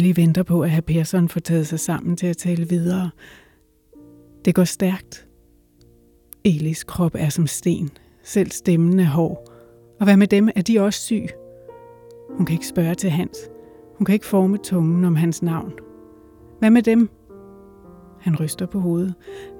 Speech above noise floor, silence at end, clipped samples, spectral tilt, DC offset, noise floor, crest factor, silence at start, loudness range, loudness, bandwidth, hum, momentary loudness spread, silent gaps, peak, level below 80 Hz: 38 dB; 0 s; under 0.1%; -6.5 dB/octave; under 0.1%; -56 dBFS; 16 dB; 0 s; 5 LU; -20 LUFS; 18 kHz; none; 12 LU; none; -4 dBFS; -52 dBFS